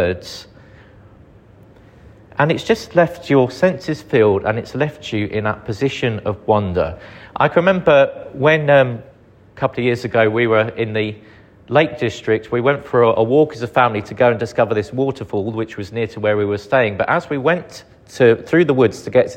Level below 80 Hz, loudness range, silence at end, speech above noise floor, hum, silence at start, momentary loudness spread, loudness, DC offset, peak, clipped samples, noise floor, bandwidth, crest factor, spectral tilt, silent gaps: -48 dBFS; 3 LU; 0 s; 29 dB; none; 0 s; 10 LU; -17 LUFS; under 0.1%; 0 dBFS; under 0.1%; -45 dBFS; 10 kHz; 16 dB; -6.5 dB/octave; none